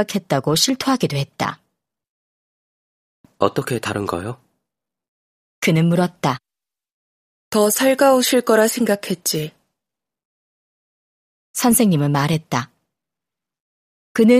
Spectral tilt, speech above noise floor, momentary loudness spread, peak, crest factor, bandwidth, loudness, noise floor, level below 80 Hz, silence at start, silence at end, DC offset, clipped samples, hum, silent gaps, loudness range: -4.5 dB/octave; 71 dB; 11 LU; 0 dBFS; 20 dB; 15.5 kHz; -18 LUFS; -89 dBFS; -58 dBFS; 0 s; 0 s; under 0.1%; under 0.1%; none; 2.09-3.24 s, 5.08-5.62 s, 6.92-7.51 s, 10.25-11.54 s, 13.60-14.15 s; 8 LU